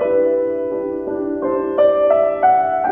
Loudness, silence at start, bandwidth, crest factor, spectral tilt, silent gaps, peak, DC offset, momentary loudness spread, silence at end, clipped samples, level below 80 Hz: -17 LUFS; 0 s; 3.8 kHz; 14 dB; -9 dB/octave; none; -2 dBFS; under 0.1%; 8 LU; 0 s; under 0.1%; -52 dBFS